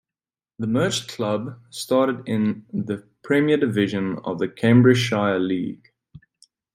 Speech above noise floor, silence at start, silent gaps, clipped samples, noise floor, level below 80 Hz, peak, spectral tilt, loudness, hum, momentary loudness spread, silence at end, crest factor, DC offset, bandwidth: over 69 dB; 0.6 s; none; under 0.1%; under -90 dBFS; -62 dBFS; -4 dBFS; -6 dB/octave; -22 LUFS; none; 14 LU; 0.55 s; 18 dB; under 0.1%; 14.5 kHz